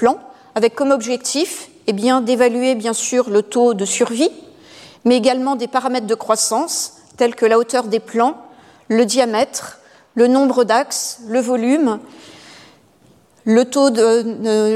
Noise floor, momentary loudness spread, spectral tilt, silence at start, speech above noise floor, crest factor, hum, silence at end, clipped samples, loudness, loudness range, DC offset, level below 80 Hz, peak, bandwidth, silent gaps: -52 dBFS; 8 LU; -3.5 dB/octave; 0 s; 36 dB; 16 dB; none; 0 s; under 0.1%; -17 LUFS; 1 LU; under 0.1%; -66 dBFS; -2 dBFS; 15 kHz; none